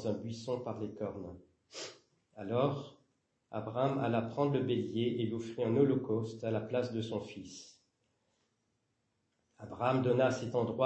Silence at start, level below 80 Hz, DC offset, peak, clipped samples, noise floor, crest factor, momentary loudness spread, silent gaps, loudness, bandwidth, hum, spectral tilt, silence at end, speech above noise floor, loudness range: 0 s; -74 dBFS; under 0.1%; -16 dBFS; under 0.1%; -80 dBFS; 20 dB; 17 LU; none; -35 LUFS; 8.4 kHz; none; -7 dB/octave; 0 s; 46 dB; 8 LU